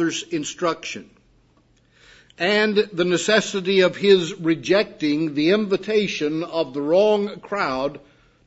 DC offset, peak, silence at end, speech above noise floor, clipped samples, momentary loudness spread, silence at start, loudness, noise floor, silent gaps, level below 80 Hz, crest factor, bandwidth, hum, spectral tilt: under 0.1%; -2 dBFS; 0.5 s; 38 dB; under 0.1%; 9 LU; 0 s; -21 LUFS; -59 dBFS; none; -62 dBFS; 18 dB; 8 kHz; none; -4.5 dB/octave